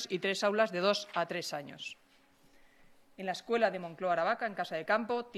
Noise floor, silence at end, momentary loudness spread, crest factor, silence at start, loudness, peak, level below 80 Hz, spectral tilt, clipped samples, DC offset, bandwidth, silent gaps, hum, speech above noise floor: -65 dBFS; 0 s; 13 LU; 20 dB; 0 s; -33 LUFS; -14 dBFS; -76 dBFS; -4 dB/octave; under 0.1%; under 0.1%; 14 kHz; none; none; 31 dB